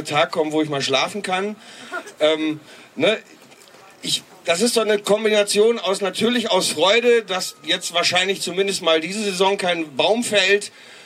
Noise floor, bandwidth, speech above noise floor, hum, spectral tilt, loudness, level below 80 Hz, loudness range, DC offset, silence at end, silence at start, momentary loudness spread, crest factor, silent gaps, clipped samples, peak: -46 dBFS; 15.5 kHz; 26 dB; none; -2.5 dB/octave; -19 LUFS; -74 dBFS; 5 LU; under 0.1%; 0 s; 0 s; 10 LU; 16 dB; none; under 0.1%; -4 dBFS